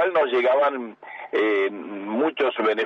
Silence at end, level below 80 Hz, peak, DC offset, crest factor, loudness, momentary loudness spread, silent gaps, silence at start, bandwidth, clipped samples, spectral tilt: 0 s; -82 dBFS; -10 dBFS; under 0.1%; 12 dB; -22 LUFS; 13 LU; none; 0 s; 6.6 kHz; under 0.1%; -5.5 dB/octave